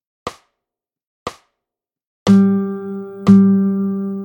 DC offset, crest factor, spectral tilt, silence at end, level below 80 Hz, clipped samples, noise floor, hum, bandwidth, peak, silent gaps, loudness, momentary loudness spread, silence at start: under 0.1%; 16 dB; -8.5 dB/octave; 0 s; -56 dBFS; under 0.1%; -85 dBFS; none; 8.2 kHz; 0 dBFS; 1.07-1.26 s, 2.06-2.26 s; -15 LUFS; 21 LU; 0.25 s